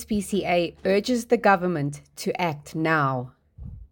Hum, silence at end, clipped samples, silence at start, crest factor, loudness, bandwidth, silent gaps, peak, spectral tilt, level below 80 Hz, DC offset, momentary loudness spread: none; 0.05 s; under 0.1%; 0 s; 20 dB; -24 LUFS; 17 kHz; none; -4 dBFS; -5.5 dB/octave; -50 dBFS; under 0.1%; 17 LU